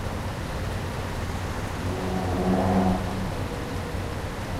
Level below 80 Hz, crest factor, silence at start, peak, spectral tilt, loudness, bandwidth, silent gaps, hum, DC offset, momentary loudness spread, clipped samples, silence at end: -36 dBFS; 16 dB; 0 s; -12 dBFS; -6.5 dB/octave; -28 LUFS; 16 kHz; none; none; under 0.1%; 9 LU; under 0.1%; 0 s